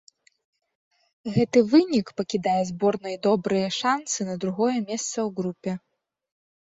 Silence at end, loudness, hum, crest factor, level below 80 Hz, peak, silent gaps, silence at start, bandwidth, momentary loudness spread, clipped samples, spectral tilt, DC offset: 0.9 s; -24 LUFS; none; 18 dB; -64 dBFS; -6 dBFS; none; 1.25 s; 8 kHz; 10 LU; under 0.1%; -5 dB/octave; under 0.1%